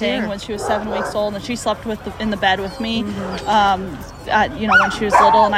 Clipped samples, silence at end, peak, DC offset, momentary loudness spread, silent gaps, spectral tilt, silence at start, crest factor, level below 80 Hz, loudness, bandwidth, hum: under 0.1%; 0 s; 0 dBFS; under 0.1%; 11 LU; none; -4.5 dB/octave; 0 s; 18 dB; -40 dBFS; -18 LUFS; 15 kHz; none